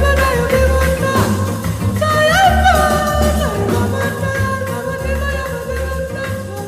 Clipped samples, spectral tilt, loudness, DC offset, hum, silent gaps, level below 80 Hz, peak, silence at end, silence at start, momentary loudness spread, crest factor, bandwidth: under 0.1%; -5 dB/octave; -16 LUFS; under 0.1%; none; none; -24 dBFS; 0 dBFS; 0 s; 0 s; 11 LU; 14 dB; 16 kHz